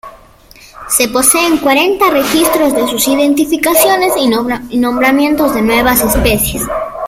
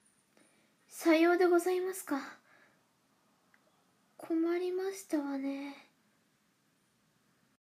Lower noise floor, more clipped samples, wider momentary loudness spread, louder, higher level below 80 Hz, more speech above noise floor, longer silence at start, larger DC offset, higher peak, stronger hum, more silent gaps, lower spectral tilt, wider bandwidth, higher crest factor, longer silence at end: second, -40 dBFS vs -74 dBFS; neither; second, 6 LU vs 19 LU; first, -10 LUFS vs -32 LUFS; first, -30 dBFS vs under -90 dBFS; second, 29 dB vs 42 dB; second, 0.05 s vs 0.9 s; neither; first, 0 dBFS vs -16 dBFS; neither; neither; about the same, -3 dB/octave vs -3 dB/octave; first, over 20 kHz vs 15.5 kHz; second, 12 dB vs 20 dB; second, 0 s vs 1.8 s